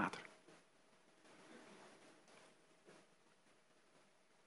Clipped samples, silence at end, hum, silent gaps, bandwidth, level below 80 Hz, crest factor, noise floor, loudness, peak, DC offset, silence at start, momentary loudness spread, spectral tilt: under 0.1%; 0 s; none; none; 11.5 kHz; under -90 dBFS; 32 dB; -74 dBFS; -57 LUFS; -24 dBFS; under 0.1%; 0 s; 12 LU; -4.5 dB/octave